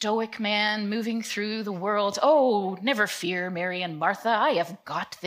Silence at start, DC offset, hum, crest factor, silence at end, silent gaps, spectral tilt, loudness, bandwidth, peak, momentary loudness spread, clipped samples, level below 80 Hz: 0 s; under 0.1%; none; 16 dB; 0 s; none; -4 dB/octave; -26 LUFS; 15.5 kHz; -10 dBFS; 8 LU; under 0.1%; -78 dBFS